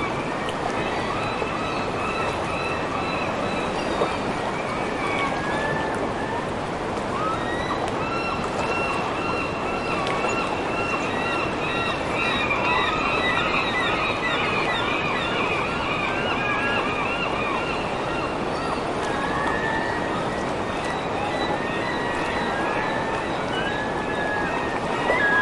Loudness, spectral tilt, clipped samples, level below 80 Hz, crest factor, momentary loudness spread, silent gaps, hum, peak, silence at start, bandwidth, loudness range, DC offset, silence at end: -24 LUFS; -4.5 dB/octave; under 0.1%; -44 dBFS; 16 dB; 5 LU; none; none; -8 dBFS; 0 s; 11.5 kHz; 3 LU; under 0.1%; 0 s